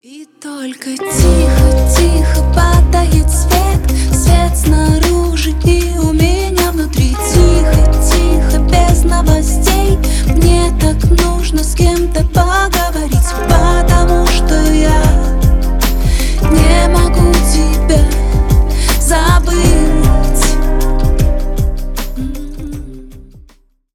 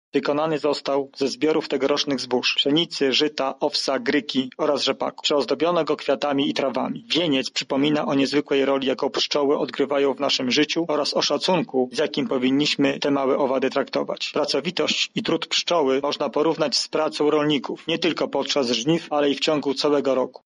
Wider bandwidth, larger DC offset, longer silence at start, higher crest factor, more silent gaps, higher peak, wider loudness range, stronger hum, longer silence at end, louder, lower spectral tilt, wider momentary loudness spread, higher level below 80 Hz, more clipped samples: first, 17.5 kHz vs 11 kHz; neither; about the same, 0.1 s vs 0.15 s; about the same, 10 dB vs 14 dB; neither; first, 0 dBFS vs -8 dBFS; about the same, 2 LU vs 1 LU; neither; first, 0.75 s vs 0.15 s; first, -12 LUFS vs -22 LUFS; first, -5.5 dB/octave vs -4 dB/octave; first, 7 LU vs 4 LU; first, -12 dBFS vs -68 dBFS; neither